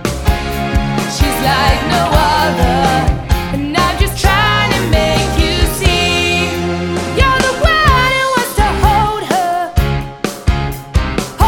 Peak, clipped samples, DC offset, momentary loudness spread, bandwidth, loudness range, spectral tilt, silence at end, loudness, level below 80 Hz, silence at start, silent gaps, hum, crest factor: 0 dBFS; under 0.1%; under 0.1%; 6 LU; 18 kHz; 1 LU; -4.5 dB/octave; 0 s; -13 LUFS; -20 dBFS; 0 s; none; none; 12 dB